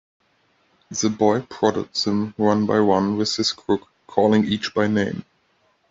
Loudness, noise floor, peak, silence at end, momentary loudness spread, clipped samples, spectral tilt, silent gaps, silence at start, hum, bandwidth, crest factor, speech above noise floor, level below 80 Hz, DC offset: -21 LUFS; -64 dBFS; -4 dBFS; 0.7 s; 7 LU; under 0.1%; -5 dB/octave; none; 0.9 s; none; 7.8 kHz; 18 dB; 44 dB; -60 dBFS; under 0.1%